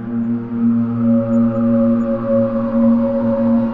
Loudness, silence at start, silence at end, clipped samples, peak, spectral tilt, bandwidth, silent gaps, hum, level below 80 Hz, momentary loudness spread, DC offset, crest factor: -16 LUFS; 0 s; 0 s; under 0.1%; -6 dBFS; -11.5 dB/octave; 3 kHz; none; none; -42 dBFS; 4 LU; under 0.1%; 10 dB